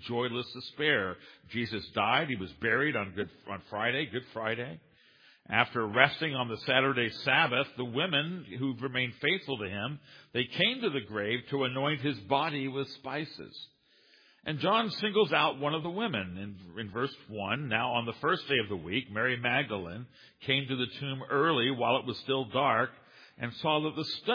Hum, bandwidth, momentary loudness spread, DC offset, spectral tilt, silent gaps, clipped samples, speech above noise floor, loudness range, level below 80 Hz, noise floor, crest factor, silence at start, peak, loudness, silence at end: none; 5.2 kHz; 13 LU; under 0.1%; -6.5 dB/octave; none; under 0.1%; 32 dB; 4 LU; -70 dBFS; -64 dBFS; 28 dB; 0 s; -4 dBFS; -30 LUFS; 0 s